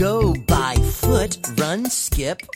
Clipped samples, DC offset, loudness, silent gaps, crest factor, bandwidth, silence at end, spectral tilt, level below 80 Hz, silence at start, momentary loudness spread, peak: under 0.1%; under 0.1%; -20 LUFS; none; 18 dB; 17 kHz; 0.1 s; -4.5 dB/octave; -26 dBFS; 0 s; 4 LU; -2 dBFS